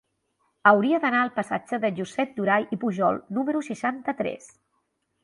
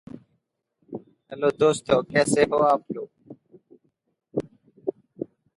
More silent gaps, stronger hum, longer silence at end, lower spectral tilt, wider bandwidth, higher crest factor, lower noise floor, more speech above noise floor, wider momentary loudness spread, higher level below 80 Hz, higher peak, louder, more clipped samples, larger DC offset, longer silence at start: neither; neither; first, 0.75 s vs 0.35 s; about the same, -6 dB/octave vs -5 dB/octave; about the same, 11.5 kHz vs 11.5 kHz; about the same, 22 dB vs 22 dB; about the same, -74 dBFS vs -74 dBFS; about the same, 50 dB vs 53 dB; second, 10 LU vs 21 LU; second, -70 dBFS vs -62 dBFS; about the same, -4 dBFS vs -4 dBFS; about the same, -25 LUFS vs -24 LUFS; neither; neither; first, 0.65 s vs 0.15 s